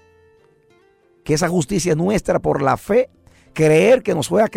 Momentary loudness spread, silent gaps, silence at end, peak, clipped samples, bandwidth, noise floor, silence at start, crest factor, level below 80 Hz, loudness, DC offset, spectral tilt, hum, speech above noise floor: 8 LU; none; 0 s; -6 dBFS; under 0.1%; 16 kHz; -55 dBFS; 1.25 s; 14 dB; -44 dBFS; -17 LUFS; under 0.1%; -5.5 dB/octave; none; 39 dB